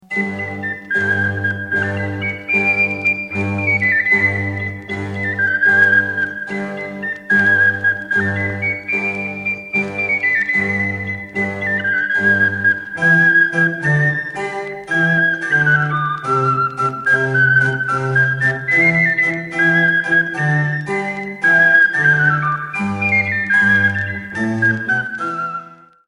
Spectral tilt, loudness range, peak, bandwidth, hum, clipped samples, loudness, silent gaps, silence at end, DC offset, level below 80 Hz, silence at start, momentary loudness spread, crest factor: -6.5 dB/octave; 4 LU; -2 dBFS; 11 kHz; none; under 0.1%; -15 LUFS; none; 0.35 s; under 0.1%; -54 dBFS; 0.1 s; 11 LU; 16 dB